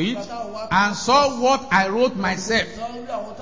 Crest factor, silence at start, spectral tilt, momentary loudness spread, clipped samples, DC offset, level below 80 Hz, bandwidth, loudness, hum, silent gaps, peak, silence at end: 18 dB; 0 s; -4 dB/octave; 13 LU; under 0.1%; 0.7%; -48 dBFS; 7.6 kHz; -20 LUFS; none; none; -4 dBFS; 0 s